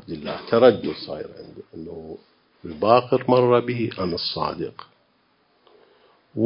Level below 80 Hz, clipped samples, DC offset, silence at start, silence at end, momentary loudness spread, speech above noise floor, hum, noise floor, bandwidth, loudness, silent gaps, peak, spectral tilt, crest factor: -56 dBFS; under 0.1%; under 0.1%; 0.1 s; 0 s; 23 LU; 42 dB; none; -64 dBFS; 5.4 kHz; -21 LUFS; none; -2 dBFS; -10.5 dB/octave; 22 dB